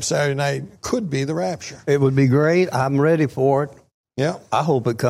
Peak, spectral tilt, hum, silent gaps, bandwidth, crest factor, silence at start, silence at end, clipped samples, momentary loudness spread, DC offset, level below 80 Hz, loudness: -6 dBFS; -6 dB/octave; none; 3.94-4.04 s; 14 kHz; 14 dB; 0 s; 0 s; under 0.1%; 9 LU; under 0.1%; -56 dBFS; -20 LUFS